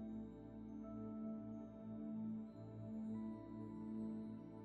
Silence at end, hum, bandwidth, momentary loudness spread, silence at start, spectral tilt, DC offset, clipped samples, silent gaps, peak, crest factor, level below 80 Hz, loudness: 0 s; none; 4.3 kHz; 6 LU; 0 s; -10 dB/octave; under 0.1%; under 0.1%; none; -38 dBFS; 12 dB; -70 dBFS; -50 LUFS